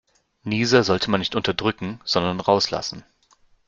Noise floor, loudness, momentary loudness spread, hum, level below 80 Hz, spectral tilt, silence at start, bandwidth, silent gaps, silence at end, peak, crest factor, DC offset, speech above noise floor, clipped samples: -59 dBFS; -22 LUFS; 13 LU; none; -54 dBFS; -4.5 dB/octave; 0.45 s; 7.6 kHz; none; 0.7 s; -2 dBFS; 20 dB; under 0.1%; 37 dB; under 0.1%